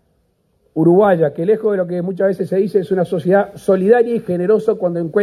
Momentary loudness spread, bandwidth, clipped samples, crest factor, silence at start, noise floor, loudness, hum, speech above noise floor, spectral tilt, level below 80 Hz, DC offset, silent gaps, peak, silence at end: 6 LU; 12.5 kHz; under 0.1%; 14 dB; 0.75 s; -62 dBFS; -16 LUFS; none; 47 dB; -9 dB/octave; -58 dBFS; under 0.1%; none; 0 dBFS; 0 s